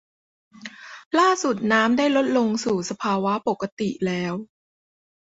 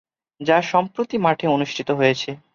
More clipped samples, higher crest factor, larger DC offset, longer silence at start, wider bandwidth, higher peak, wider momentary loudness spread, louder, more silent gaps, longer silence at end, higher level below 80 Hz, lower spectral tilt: neither; about the same, 18 dB vs 18 dB; neither; first, 0.55 s vs 0.4 s; about the same, 8 kHz vs 7.4 kHz; about the same, -4 dBFS vs -4 dBFS; first, 19 LU vs 7 LU; about the same, -22 LUFS vs -20 LUFS; first, 1.06-1.11 s, 3.72-3.77 s vs none; first, 0.75 s vs 0.15 s; about the same, -64 dBFS vs -64 dBFS; about the same, -4.5 dB/octave vs -5.5 dB/octave